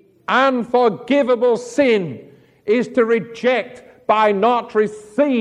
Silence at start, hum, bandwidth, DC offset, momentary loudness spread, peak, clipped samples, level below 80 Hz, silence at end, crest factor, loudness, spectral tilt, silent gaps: 0.3 s; none; 10.5 kHz; under 0.1%; 7 LU; -2 dBFS; under 0.1%; -64 dBFS; 0 s; 16 dB; -17 LUFS; -5.5 dB/octave; none